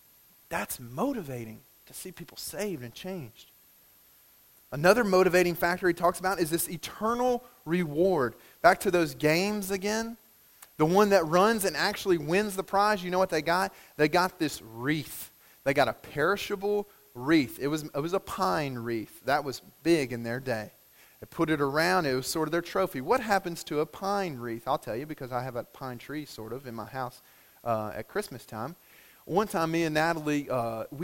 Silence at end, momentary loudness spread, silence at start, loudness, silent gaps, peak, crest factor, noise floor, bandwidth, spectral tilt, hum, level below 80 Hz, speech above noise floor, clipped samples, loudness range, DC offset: 0 s; 15 LU; 0.5 s; -28 LUFS; none; -4 dBFS; 24 dB; -60 dBFS; 16.5 kHz; -5 dB/octave; none; -60 dBFS; 31 dB; under 0.1%; 10 LU; under 0.1%